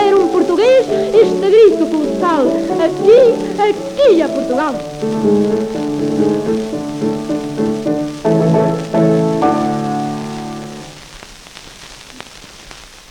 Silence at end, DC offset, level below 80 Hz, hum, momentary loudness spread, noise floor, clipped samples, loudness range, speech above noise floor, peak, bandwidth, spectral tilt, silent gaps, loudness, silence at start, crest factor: 0.15 s; under 0.1%; -44 dBFS; none; 24 LU; -36 dBFS; under 0.1%; 8 LU; 24 dB; 0 dBFS; 13 kHz; -6.5 dB/octave; none; -14 LUFS; 0 s; 14 dB